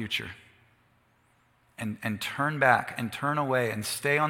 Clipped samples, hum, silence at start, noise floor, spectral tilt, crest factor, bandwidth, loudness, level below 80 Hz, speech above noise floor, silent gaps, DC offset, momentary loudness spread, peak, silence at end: under 0.1%; none; 0 s; -66 dBFS; -4.5 dB/octave; 24 dB; 17 kHz; -28 LUFS; -68 dBFS; 38 dB; none; under 0.1%; 14 LU; -6 dBFS; 0 s